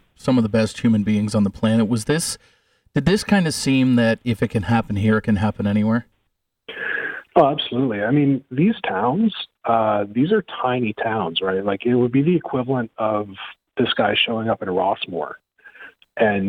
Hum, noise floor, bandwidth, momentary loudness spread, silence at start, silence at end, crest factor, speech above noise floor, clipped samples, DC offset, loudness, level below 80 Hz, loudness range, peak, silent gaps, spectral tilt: none; -72 dBFS; 15.5 kHz; 8 LU; 0.25 s; 0 s; 18 dB; 53 dB; under 0.1%; under 0.1%; -20 LUFS; -50 dBFS; 2 LU; -2 dBFS; none; -6 dB/octave